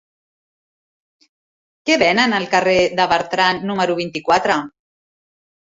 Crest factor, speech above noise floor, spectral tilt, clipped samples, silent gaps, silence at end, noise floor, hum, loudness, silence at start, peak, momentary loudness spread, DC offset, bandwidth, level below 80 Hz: 18 dB; over 73 dB; -4 dB/octave; under 0.1%; none; 1.1 s; under -90 dBFS; none; -17 LUFS; 1.85 s; -2 dBFS; 7 LU; under 0.1%; 8 kHz; -56 dBFS